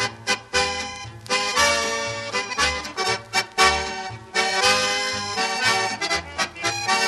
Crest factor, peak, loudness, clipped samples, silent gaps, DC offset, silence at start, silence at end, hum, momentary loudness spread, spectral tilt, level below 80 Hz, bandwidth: 18 dB; -4 dBFS; -21 LUFS; under 0.1%; none; under 0.1%; 0 s; 0 s; none; 8 LU; -1 dB/octave; -46 dBFS; 13 kHz